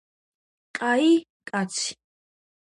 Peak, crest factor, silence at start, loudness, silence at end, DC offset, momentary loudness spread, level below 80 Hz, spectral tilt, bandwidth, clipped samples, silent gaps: -10 dBFS; 18 dB; 0.75 s; -24 LUFS; 0.7 s; under 0.1%; 12 LU; -76 dBFS; -3.5 dB/octave; 11.5 kHz; under 0.1%; 1.30-1.40 s